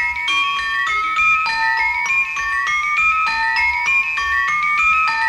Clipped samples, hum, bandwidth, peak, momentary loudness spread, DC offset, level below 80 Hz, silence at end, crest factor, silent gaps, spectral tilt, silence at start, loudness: under 0.1%; none; 16 kHz; -6 dBFS; 3 LU; under 0.1%; -46 dBFS; 0 s; 10 dB; none; 0.5 dB/octave; 0 s; -16 LUFS